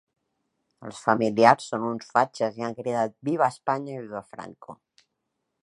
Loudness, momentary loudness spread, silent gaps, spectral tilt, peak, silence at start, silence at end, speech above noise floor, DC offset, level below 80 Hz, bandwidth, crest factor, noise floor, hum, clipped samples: -25 LUFS; 22 LU; none; -5.5 dB/octave; 0 dBFS; 0.8 s; 0.9 s; 55 dB; under 0.1%; -72 dBFS; 11.5 kHz; 26 dB; -80 dBFS; none; under 0.1%